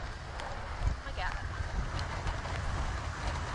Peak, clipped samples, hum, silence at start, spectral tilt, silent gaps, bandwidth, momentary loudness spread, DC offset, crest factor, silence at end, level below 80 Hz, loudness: -20 dBFS; under 0.1%; none; 0 s; -5 dB/octave; none; 11.5 kHz; 4 LU; under 0.1%; 16 dB; 0 s; -38 dBFS; -37 LUFS